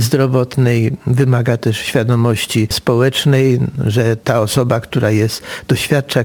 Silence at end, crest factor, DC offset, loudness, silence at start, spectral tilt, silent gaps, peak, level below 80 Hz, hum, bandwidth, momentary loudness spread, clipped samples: 0 s; 14 dB; under 0.1%; -15 LUFS; 0 s; -6 dB/octave; none; 0 dBFS; -44 dBFS; none; over 20 kHz; 4 LU; under 0.1%